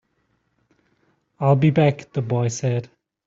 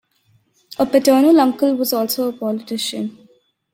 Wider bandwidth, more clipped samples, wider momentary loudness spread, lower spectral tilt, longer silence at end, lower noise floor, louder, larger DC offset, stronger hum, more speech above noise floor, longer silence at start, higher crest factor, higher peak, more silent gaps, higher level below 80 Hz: second, 7.8 kHz vs 16.5 kHz; neither; second, 9 LU vs 13 LU; first, -7 dB/octave vs -4 dB/octave; second, 0.4 s vs 0.6 s; first, -69 dBFS vs -60 dBFS; second, -21 LUFS vs -17 LUFS; neither; neither; first, 49 dB vs 43 dB; first, 1.4 s vs 0.7 s; about the same, 18 dB vs 16 dB; second, -6 dBFS vs -2 dBFS; neither; about the same, -60 dBFS vs -62 dBFS